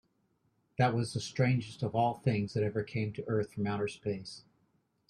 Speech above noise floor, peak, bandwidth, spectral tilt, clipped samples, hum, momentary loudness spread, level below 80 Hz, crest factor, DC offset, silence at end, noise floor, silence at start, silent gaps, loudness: 43 dB; -14 dBFS; 11 kHz; -6.5 dB/octave; under 0.1%; none; 8 LU; -66 dBFS; 18 dB; under 0.1%; 0.7 s; -75 dBFS; 0.8 s; none; -33 LUFS